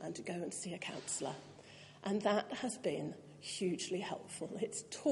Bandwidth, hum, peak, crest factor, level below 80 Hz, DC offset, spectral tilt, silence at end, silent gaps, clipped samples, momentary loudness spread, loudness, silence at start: 11.5 kHz; none; -20 dBFS; 20 dB; -82 dBFS; under 0.1%; -4 dB/octave; 0 s; none; under 0.1%; 12 LU; -40 LUFS; 0 s